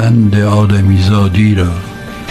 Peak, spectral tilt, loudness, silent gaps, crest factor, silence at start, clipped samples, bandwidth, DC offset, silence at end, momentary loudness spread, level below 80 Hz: 0 dBFS; -7.5 dB/octave; -10 LUFS; none; 10 dB; 0 s; under 0.1%; 12 kHz; under 0.1%; 0 s; 13 LU; -32 dBFS